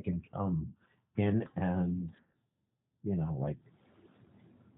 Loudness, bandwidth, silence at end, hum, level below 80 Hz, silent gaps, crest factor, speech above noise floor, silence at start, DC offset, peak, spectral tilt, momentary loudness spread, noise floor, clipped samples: -35 LUFS; 3.7 kHz; 1.2 s; none; -62 dBFS; none; 18 dB; 50 dB; 0 s; under 0.1%; -18 dBFS; -8 dB/octave; 12 LU; -83 dBFS; under 0.1%